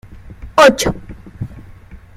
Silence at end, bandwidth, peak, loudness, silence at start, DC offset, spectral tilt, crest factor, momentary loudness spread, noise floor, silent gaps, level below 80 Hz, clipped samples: 0.2 s; 16 kHz; 0 dBFS; -12 LUFS; 0.25 s; under 0.1%; -4 dB/octave; 18 dB; 21 LU; -38 dBFS; none; -36 dBFS; under 0.1%